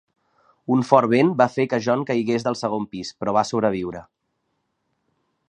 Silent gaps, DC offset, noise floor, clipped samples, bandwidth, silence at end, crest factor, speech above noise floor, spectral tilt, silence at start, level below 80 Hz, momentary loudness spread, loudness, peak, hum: none; under 0.1%; -74 dBFS; under 0.1%; 10 kHz; 1.45 s; 22 dB; 53 dB; -6.5 dB/octave; 0.7 s; -60 dBFS; 13 LU; -21 LUFS; 0 dBFS; none